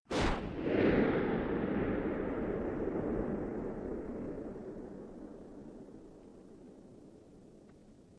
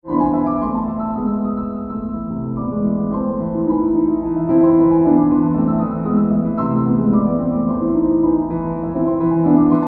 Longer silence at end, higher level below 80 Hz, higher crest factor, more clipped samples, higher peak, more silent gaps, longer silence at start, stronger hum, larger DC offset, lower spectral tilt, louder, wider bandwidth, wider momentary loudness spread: about the same, 0 s vs 0 s; second, -50 dBFS vs -40 dBFS; first, 20 dB vs 14 dB; neither; second, -16 dBFS vs -2 dBFS; neither; about the same, 0.1 s vs 0.05 s; neither; neither; second, -7 dB/octave vs -13.5 dB/octave; second, -35 LUFS vs -17 LUFS; first, 10.5 kHz vs 2.7 kHz; first, 24 LU vs 9 LU